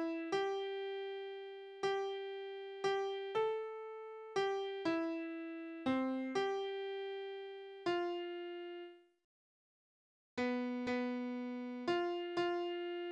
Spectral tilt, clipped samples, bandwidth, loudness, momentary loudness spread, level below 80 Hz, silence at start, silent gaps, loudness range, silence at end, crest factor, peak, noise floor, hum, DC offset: -4.5 dB/octave; under 0.1%; 9.4 kHz; -40 LUFS; 10 LU; -82 dBFS; 0 s; 9.24-10.37 s; 4 LU; 0 s; 16 dB; -24 dBFS; under -90 dBFS; none; under 0.1%